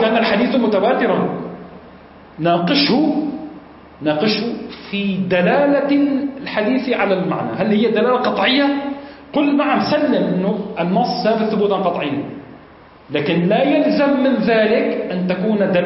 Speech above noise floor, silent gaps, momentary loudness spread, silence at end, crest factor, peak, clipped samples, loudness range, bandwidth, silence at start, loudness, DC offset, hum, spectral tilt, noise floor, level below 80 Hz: 27 dB; none; 10 LU; 0 s; 14 dB; -4 dBFS; under 0.1%; 3 LU; 5.8 kHz; 0 s; -17 LUFS; under 0.1%; none; -9.5 dB/octave; -43 dBFS; -56 dBFS